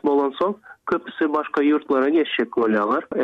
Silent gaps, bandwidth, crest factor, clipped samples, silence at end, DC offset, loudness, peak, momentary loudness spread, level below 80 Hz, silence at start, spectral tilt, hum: none; 6 kHz; 12 dB; under 0.1%; 0 s; under 0.1%; -21 LUFS; -8 dBFS; 7 LU; -64 dBFS; 0.05 s; -7 dB/octave; none